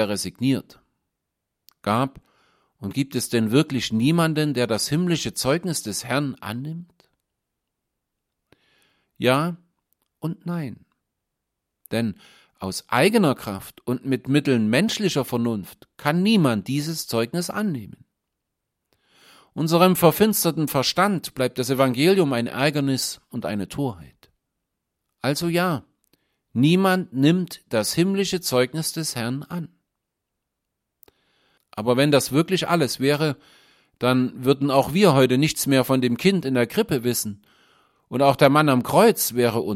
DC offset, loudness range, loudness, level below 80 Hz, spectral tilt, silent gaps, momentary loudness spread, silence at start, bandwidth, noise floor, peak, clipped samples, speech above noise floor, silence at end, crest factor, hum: under 0.1%; 9 LU; -22 LUFS; -60 dBFS; -5 dB/octave; none; 13 LU; 0 s; 16.5 kHz; -81 dBFS; -2 dBFS; under 0.1%; 60 dB; 0 s; 22 dB; none